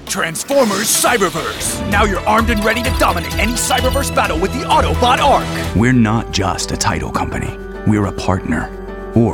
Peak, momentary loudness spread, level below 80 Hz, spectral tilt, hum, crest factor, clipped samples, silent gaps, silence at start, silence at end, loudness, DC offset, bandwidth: -2 dBFS; 7 LU; -28 dBFS; -4 dB/octave; none; 14 dB; under 0.1%; none; 0 s; 0 s; -15 LUFS; under 0.1%; 18 kHz